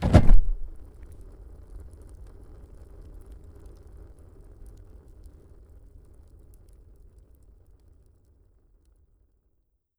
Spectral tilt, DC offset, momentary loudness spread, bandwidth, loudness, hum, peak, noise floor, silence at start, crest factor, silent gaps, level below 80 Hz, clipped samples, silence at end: -8 dB/octave; under 0.1%; 25 LU; 6 kHz; -24 LUFS; none; -2 dBFS; -72 dBFS; 0 s; 24 dB; none; -30 dBFS; under 0.1%; 9.3 s